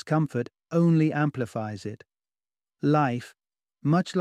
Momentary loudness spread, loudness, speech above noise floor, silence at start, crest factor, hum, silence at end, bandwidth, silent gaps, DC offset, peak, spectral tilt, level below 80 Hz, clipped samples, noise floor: 13 LU; -26 LUFS; over 65 dB; 0.05 s; 16 dB; none; 0 s; 10.5 kHz; none; under 0.1%; -10 dBFS; -8 dB/octave; -70 dBFS; under 0.1%; under -90 dBFS